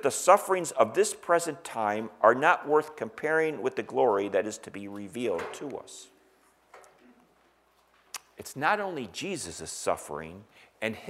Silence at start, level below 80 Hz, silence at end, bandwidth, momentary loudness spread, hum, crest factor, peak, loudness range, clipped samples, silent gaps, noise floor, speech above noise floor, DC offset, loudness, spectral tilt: 0 s; -70 dBFS; 0 s; 16 kHz; 18 LU; none; 24 dB; -6 dBFS; 13 LU; under 0.1%; none; -65 dBFS; 37 dB; under 0.1%; -28 LUFS; -3.5 dB/octave